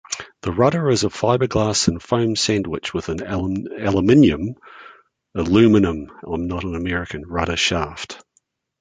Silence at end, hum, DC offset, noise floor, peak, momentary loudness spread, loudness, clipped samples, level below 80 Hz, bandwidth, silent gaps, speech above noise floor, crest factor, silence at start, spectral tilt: 0.65 s; none; under 0.1%; -66 dBFS; -2 dBFS; 15 LU; -19 LUFS; under 0.1%; -40 dBFS; 9.6 kHz; none; 47 dB; 18 dB; 0.1 s; -5 dB/octave